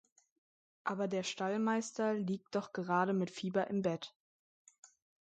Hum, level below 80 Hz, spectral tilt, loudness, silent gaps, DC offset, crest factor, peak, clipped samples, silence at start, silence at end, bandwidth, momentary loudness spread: none; -82 dBFS; -5.5 dB/octave; -36 LUFS; 4.16-4.65 s, 4.78-4.83 s; under 0.1%; 18 dB; -20 dBFS; under 0.1%; 0.85 s; 0.35 s; 9 kHz; 7 LU